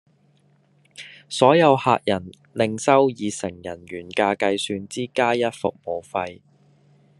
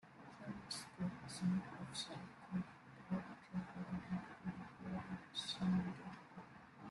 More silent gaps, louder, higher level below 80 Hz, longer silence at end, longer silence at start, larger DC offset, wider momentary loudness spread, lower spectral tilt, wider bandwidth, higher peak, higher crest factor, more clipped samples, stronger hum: neither; first, -21 LUFS vs -46 LUFS; first, -66 dBFS vs -72 dBFS; first, 0.85 s vs 0 s; first, 1 s vs 0.05 s; neither; first, 18 LU vs 14 LU; about the same, -5 dB/octave vs -5.5 dB/octave; about the same, 11.5 kHz vs 12 kHz; first, -2 dBFS vs -28 dBFS; about the same, 22 dB vs 18 dB; neither; neither